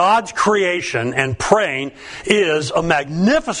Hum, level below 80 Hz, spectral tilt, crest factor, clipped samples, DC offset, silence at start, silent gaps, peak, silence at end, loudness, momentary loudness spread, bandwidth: none; -44 dBFS; -4.5 dB/octave; 18 dB; under 0.1%; under 0.1%; 0 s; none; 0 dBFS; 0 s; -17 LUFS; 5 LU; 11 kHz